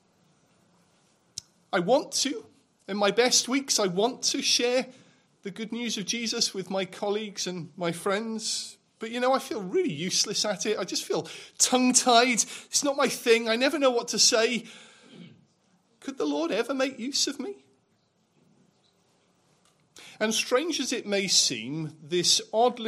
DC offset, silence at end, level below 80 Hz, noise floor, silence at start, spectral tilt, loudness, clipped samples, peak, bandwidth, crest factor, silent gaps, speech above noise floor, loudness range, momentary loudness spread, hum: under 0.1%; 0 s; -78 dBFS; -69 dBFS; 1.75 s; -2 dB/octave; -25 LUFS; under 0.1%; -6 dBFS; 15.5 kHz; 22 dB; none; 43 dB; 8 LU; 15 LU; none